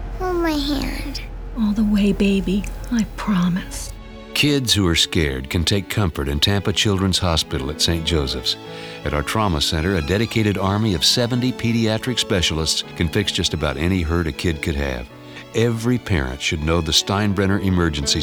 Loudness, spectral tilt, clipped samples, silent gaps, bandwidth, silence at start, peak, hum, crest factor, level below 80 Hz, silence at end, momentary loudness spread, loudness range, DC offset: -20 LUFS; -4.5 dB/octave; under 0.1%; none; over 20 kHz; 0 s; -6 dBFS; none; 14 dB; -32 dBFS; 0 s; 8 LU; 3 LU; under 0.1%